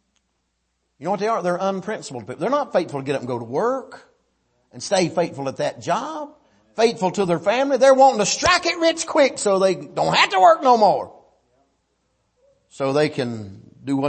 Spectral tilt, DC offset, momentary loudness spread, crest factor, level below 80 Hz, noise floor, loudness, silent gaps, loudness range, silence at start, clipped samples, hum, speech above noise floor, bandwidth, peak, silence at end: -4 dB/octave; under 0.1%; 16 LU; 18 dB; -58 dBFS; -72 dBFS; -19 LUFS; none; 8 LU; 1 s; under 0.1%; none; 53 dB; 8.8 kHz; -2 dBFS; 0 s